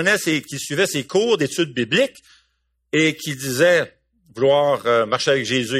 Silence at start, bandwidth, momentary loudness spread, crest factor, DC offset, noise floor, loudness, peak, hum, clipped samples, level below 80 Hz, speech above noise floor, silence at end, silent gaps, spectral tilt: 0 s; 15.5 kHz; 7 LU; 16 dB; under 0.1%; -68 dBFS; -19 LUFS; -4 dBFS; none; under 0.1%; -62 dBFS; 49 dB; 0 s; none; -4 dB/octave